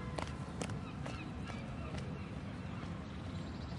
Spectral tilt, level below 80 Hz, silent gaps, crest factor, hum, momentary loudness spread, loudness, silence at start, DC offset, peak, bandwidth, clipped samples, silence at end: -6 dB/octave; -54 dBFS; none; 20 dB; none; 3 LU; -44 LUFS; 0 s; under 0.1%; -22 dBFS; 11.5 kHz; under 0.1%; 0 s